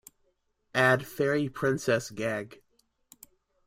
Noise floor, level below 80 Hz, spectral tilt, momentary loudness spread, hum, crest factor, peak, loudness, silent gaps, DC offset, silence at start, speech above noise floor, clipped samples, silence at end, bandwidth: -73 dBFS; -64 dBFS; -5 dB/octave; 9 LU; none; 22 dB; -10 dBFS; -28 LUFS; none; under 0.1%; 0.75 s; 46 dB; under 0.1%; 1.1 s; 16.5 kHz